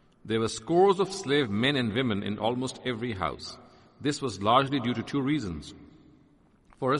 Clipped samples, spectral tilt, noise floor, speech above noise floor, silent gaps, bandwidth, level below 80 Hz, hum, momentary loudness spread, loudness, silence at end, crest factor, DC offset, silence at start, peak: under 0.1%; -5.5 dB/octave; -61 dBFS; 34 dB; none; 11.5 kHz; -60 dBFS; none; 12 LU; -28 LUFS; 0 s; 20 dB; under 0.1%; 0.25 s; -8 dBFS